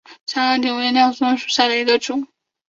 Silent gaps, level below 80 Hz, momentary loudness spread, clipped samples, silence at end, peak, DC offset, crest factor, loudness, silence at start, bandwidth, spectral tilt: 0.21-0.26 s; -68 dBFS; 10 LU; under 0.1%; 0.45 s; -2 dBFS; under 0.1%; 16 dB; -18 LUFS; 0.1 s; 7.8 kHz; -1.5 dB/octave